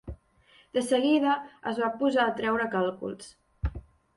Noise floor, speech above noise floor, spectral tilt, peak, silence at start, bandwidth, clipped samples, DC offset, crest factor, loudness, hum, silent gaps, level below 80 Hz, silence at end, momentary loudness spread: -61 dBFS; 34 dB; -5.5 dB/octave; -12 dBFS; 0.05 s; 11.5 kHz; under 0.1%; under 0.1%; 16 dB; -28 LUFS; none; none; -44 dBFS; 0.35 s; 18 LU